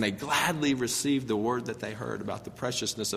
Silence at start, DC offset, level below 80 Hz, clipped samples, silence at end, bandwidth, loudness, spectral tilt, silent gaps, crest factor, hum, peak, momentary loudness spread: 0 s; under 0.1%; -62 dBFS; under 0.1%; 0 s; 15.5 kHz; -29 LUFS; -3.5 dB/octave; none; 18 dB; none; -12 dBFS; 9 LU